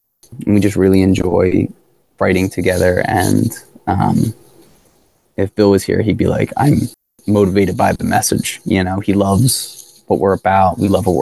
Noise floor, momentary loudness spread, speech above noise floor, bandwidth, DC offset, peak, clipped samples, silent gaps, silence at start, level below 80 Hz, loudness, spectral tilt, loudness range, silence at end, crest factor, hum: -56 dBFS; 9 LU; 42 dB; 13 kHz; 0.2%; 0 dBFS; under 0.1%; none; 0.3 s; -34 dBFS; -15 LUFS; -6 dB/octave; 2 LU; 0 s; 14 dB; none